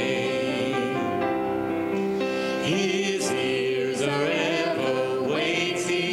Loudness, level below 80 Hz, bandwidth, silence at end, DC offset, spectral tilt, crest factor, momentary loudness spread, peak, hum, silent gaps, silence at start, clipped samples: -25 LUFS; -62 dBFS; 16 kHz; 0 s; under 0.1%; -4.5 dB/octave; 14 dB; 3 LU; -10 dBFS; none; none; 0 s; under 0.1%